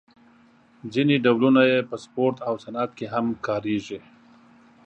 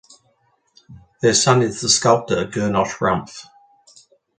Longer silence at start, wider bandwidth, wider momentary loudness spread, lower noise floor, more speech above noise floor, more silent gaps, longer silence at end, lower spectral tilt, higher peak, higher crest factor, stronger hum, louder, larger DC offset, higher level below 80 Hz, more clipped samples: about the same, 0.85 s vs 0.9 s; second, 8.4 kHz vs 9.6 kHz; first, 14 LU vs 10 LU; second, -56 dBFS vs -63 dBFS; second, 33 dB vs 45 dB; neither; about the same, 0.85 s vs 0.95 s; first, -7 dB/octave vs -3.5 dB/octave; second, -4 dBFS vs 0 dBFS; about the same, 20 dB vs 20 dB; neither; second, -23 LUFS vs -17 LUFS; neither; second, -66 dBFS vs -52 dBFS; neither